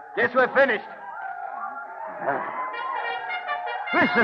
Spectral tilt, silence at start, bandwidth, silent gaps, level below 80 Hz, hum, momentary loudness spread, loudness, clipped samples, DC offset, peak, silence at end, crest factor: -6.5 dB/octave; 0 s; 6.4 kHz; none; -74 dBFS; none; 15 LU; -26 LUFS; under 0.1%; under 0.1%; -8 dBFS; 0 s; 18 dB